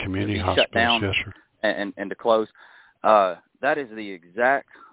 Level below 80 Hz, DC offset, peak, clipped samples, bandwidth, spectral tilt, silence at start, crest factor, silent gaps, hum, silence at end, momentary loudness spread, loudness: -46 dBFS; under 0.1%; -4 dBFS; under 0.1%; 4 kHz; -8.5 dB/octave; 0 s; 20 dB; none; none; 0.3 s; 14 LU; -22 LUFS